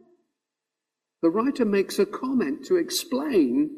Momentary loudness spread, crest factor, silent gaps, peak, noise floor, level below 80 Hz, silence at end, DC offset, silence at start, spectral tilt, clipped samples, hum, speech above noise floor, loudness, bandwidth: 4 LU; 16 dB; none; -10 dBFS; -86 dBFS; -66 dBFS; 0 s; under 0.1%; 1.25 s; -4.5 dB/octave; under 0.1%; none; 63 dB; -24 LUFS; 15.5 kHz